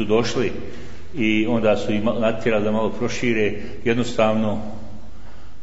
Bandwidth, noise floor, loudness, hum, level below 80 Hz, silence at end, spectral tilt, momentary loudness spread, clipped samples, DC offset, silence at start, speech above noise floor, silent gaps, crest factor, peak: 8 kHz; -42 dBFS; -21 LUFS; none; -46 dBFS; 0.1 s; -6 dB/octave; 16 LU; under 0.1%; 5%; 0 s; 21 dB; none; 18 dB; -6 dBFS